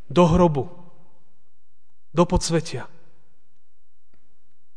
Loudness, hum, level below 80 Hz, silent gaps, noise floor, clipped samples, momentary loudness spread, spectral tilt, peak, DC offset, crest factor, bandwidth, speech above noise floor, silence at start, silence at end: -21 LUFS; none; -38 dBFS; none; -74 dBFS; under 0.1%; 19 LU; -6.5 dB/octave; -4 dBFS; 2%; 20 dB; 10 kHz; 55 dB; 0.1 s; 1.9 s